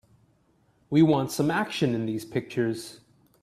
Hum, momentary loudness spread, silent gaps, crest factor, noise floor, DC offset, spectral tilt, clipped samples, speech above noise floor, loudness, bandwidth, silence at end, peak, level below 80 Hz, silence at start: none; 10 LU; none; 18 dB; -65 dBFS; under 0.1%; -6 dB/octave; under 0.1%; 40 dB; -26 LUFS; 14.5 kHz; 0.45 s; -8 dBFS; -64 dBFS; 0.9 s